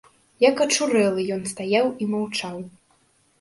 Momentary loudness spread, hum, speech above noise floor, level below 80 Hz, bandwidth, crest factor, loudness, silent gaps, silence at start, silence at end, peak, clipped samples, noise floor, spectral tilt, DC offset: 12 LU; none; 41 dB; -66 dBFS; 11.5 kHz; 18 dB; -22 LUFS; none; 0.4 s; 0.7 s; -6 dBFS; under 0.1%; -62 dBFS; -3.5 dB/octave; under 0.1%